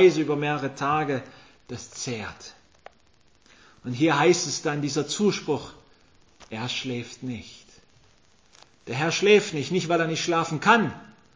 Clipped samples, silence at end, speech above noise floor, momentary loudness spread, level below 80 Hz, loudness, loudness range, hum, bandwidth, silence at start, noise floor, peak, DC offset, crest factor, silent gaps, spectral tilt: under 0.1%; 0.3 s; 38 dB; 20 LU; -62 dBFS; -24 LUFS; 10 LU; none; 8 kHz; 0 s; -62 dBFS; -4 dBFS; under 0.1%; 22 dB; none; -4.5 dB/octave